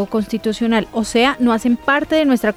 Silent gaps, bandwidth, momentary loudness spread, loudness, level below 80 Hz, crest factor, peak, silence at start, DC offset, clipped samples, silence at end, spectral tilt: none; 14.5 kHz; 5 LU; -17 LUFS; -44 dBFS; 12 dB; -4 dBFS; 0 s; under 0.1%; under 0.1%; 0.05 s; -4.5 dB/octave